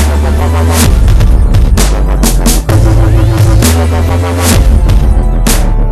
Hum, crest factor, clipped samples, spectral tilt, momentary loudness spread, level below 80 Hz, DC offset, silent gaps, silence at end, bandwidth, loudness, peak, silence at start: none; 6 dB; 3%; -5.5 dB/octave; 3 LU; -8 dBFS; 1%; none; 0 s; 14 kHz; -9 LUFS; 0 dBFS; 0 s